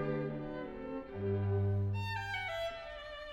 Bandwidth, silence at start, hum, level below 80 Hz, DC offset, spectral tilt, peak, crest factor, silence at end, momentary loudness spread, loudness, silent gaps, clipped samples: 7.8 kHz; 0 s; none; -56 dBFS; under 0.1%; -7.5 dB/octave; -24 dBFS; 12 dB; 0 s; 10 LU; -38 LUFS; none; under 0.1%